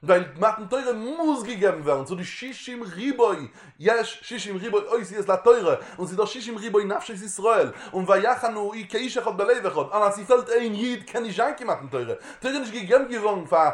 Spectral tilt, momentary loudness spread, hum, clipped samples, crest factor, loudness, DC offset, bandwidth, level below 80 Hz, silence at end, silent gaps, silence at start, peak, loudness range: -4.5 dB/octave; 11 LU; none; under 0.1%; 20 dB; -24 LUFS; under 0.1%; 11.5 kHz; -66 dBFS; 0 s; none; 0 s; -4 dBFS; 3 LU